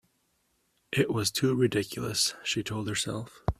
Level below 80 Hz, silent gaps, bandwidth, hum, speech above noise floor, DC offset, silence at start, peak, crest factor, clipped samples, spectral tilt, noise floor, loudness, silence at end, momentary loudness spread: -48 dBFS; none; 15.5 kHz; none; 44 dB; under 0.1%; 0.9 s; -10 dBFS; 20 dB; under 0.1%; -4 dB/octave; -73 dBFS; -29 LUFS; 0.05 s; 6 LU